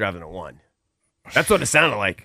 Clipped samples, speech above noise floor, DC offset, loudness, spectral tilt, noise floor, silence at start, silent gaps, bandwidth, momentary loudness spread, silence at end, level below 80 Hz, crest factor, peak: under 0.1%; 52 dB; under 0.1%; -18 LUFS; -3 dB/octave; -74 dBFS; 0 s; none; 16 kHz; 20 LU; 0.05 s; -48 dBFS; 20 dB; -2 dBFS